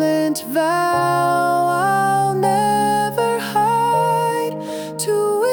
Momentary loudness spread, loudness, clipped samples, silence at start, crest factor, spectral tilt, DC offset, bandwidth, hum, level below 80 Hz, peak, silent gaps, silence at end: 4 LU; -18 LUFS; under 0.1%; 0 s; 12 dB; -4.5 dB/octave; under 0.1%; over 20 kHz; none; -62 dBFS; -4 dBFS; none; 0 s